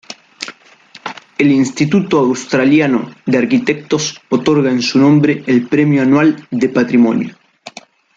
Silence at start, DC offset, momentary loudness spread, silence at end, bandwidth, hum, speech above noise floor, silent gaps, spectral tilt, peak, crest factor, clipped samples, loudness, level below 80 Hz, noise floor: 0.1 s; under 0.1%; 17 LU; 0.5 s; 7.8 kHz; none; 30 dB; none; -6 dB/octave; 0 dBFS; 14 dB; under 0.1%; -13 LUFS; -56 dBFS; -43 dBFS